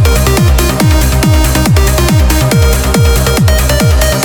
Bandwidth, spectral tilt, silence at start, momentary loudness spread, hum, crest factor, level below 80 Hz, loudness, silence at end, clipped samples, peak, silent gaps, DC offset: over 20 kHz; -5 dB/octave; 0 s; 1 LU; none; 8 dB; -12 dBFS; -9 LUFS; 0 s; under 0.1%; 0 dBFS; none; under 0.1%